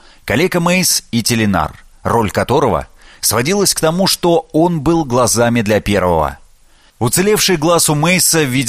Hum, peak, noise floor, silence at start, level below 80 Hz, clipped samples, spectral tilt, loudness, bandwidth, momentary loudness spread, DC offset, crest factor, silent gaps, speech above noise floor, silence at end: none; 0 dBFS; -47 dBFS; 0.25 s; -36 dBFS; under 0.1%; -4 dB/octave; -13 LUFS; 15.5 kHz; 6 LU; under 0.1%; 14 dB; none; 34 dB; 0 s